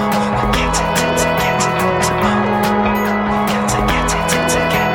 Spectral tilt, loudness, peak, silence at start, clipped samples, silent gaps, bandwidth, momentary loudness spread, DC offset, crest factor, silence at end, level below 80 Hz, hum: -4 dB/octave; -15 LUFS; -2 dBFS; 0 s; under 0.1%; none; 17.5 kHz; 2 LU; under 0.1%; 14 dB; 0 s; -30 dBFS; none